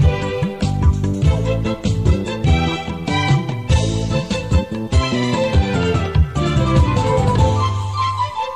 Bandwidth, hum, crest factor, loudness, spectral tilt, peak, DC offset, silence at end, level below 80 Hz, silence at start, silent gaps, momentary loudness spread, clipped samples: 10.5 kHz; none; 14 dB; -18 LUFS; -6.5 dB/octave; -4 dBFS; 0.5%; 0 s; -24 dBFS; 0 s; none; 5 LU; under 0.1%